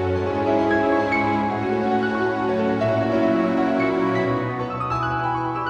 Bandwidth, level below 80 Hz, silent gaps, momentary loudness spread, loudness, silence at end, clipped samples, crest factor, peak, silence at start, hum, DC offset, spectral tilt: 8.6 kHz; -48 dBFS; none; 4 LU; -21 LUFS; 0 s; under 0.1%; 12 dB; -8 dBFS; 0 s; none; under 0.1%; -7.5 dB/octave